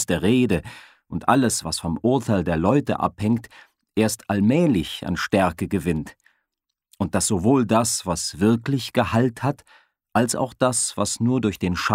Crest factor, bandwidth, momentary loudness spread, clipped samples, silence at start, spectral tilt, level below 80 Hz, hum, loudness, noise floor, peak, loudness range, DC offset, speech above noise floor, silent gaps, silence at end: 20 dB; 16 kHz; 8 LU; under 0.1%; 0 s; -5 dB/octave; -48 dBFS; none; -22 LUFS; -81 dBFS; -2 dBFS; 1 LU; under 0.1%; 60 dB; none; 0 s